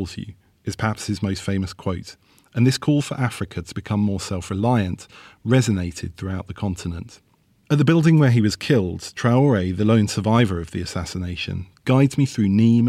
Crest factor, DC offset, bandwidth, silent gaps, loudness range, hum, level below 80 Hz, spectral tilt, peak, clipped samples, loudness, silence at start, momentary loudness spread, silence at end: 14 dB; under 0.1%; 14 kHz; none; 6 LU; none; -50 dBFS; -6.5 dB/octave; -6 dBFS; under 0.1%; -21 LUFS; 0 s; 14 LU; 0 s